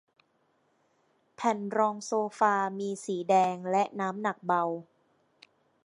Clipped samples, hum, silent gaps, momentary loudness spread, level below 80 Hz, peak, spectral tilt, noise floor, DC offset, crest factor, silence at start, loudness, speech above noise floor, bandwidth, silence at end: under 0.1%; none; none; 8 LU; -84 dBFS; -12 dBFS; -5 dB/octave; -71 dBFS; under 0.1%; 20 dB; 1.4 s; -29 LUFS; 43 dB; 11.5 kHz; 1.05 s